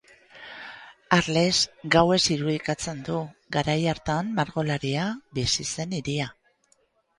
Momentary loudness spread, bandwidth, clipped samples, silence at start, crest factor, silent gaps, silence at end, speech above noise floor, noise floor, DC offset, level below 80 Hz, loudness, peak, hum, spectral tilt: 18 LU; 11.5 kHz; under 0.1%; 0.35 s; 24 dB; none; 0.85 s; 42 dB; -67 dBFS; under 0.1%; -52 dBFS; -25 LUFS; -2 dBFS; none; -4 dB/octave